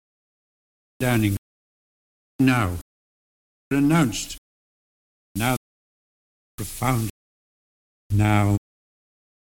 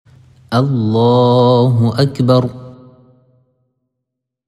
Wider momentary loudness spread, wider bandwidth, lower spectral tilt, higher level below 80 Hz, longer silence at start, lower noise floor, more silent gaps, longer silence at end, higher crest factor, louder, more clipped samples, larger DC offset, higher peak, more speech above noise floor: first, 15 LU vs 8 LU; first, 18.5 kHz vs 10.5 kHz; second, -6 dB/octave vs -8.5 dB/octave; first, -46 dBFS vs -54 dBFS; first, 1 s vs 0.5 s; first, under -90 dBFS vs -78 dBFS; first, 1.38-2.39 s, 2.81-3.71 s, 4.38-5.35 s, 5.57-6.58 s, 7.10-8.10 s vs none; second, 0.95 s vs 1.75 s; first, 20 dB vs 14 dB; second, -23 LUFS vs -13 LUFS; neither; neither; second, -6 dBFS vs 0 dBFS; first, over 70 dB vs 66 dB